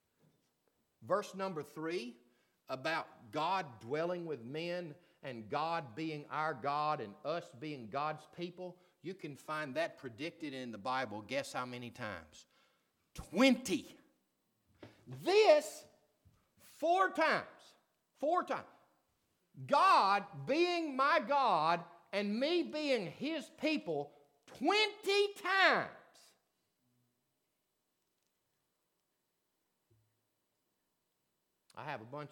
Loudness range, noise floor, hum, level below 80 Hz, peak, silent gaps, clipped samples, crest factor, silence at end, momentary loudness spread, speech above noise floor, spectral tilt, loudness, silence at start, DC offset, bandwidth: 9 LU; -84 dBFS; none; -76 dBFS; -14 dBFS; none; under 0.1%; 24 dB; 0.05 s; 17 LU; 49 dB; -4.5 dB/octave; -35 LUFS; 1 s; under 0.1%; 19 kHz